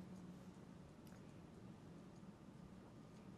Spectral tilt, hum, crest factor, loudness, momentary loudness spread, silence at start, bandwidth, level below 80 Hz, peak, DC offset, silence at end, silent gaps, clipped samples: -7 dB/octave; none; 14 dB; -60 LUFS; 3 LU; 0 s; 13 kHz; -74 dBFS; -46 dBFS; under 0.1%; 0 s; none; under 0.1%